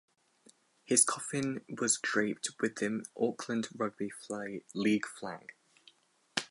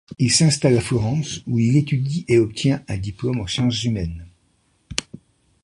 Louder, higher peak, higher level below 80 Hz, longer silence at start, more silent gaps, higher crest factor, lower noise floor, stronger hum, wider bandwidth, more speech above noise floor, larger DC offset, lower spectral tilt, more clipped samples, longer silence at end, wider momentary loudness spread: second, -33 LUFS vs -20 LUFS; second, -8 dBFS vs -2 dBFS; second, -80 dBFS vs -42 dBFS; first, 0.9 s vs 0.1 s; neither; first, 26 dB vs 20 dB; about the same, -66 dBFS vs -63 dBFS; neither; about the same, 11.5 kHz vs 11.5 kHz; second, 32 dB vs 44 dB; neither; second, -3 dB/octave vs -5 dB/octave; neither; second, 0.05 s vs 0.6 s; about the same, 13 LU vs 12 LU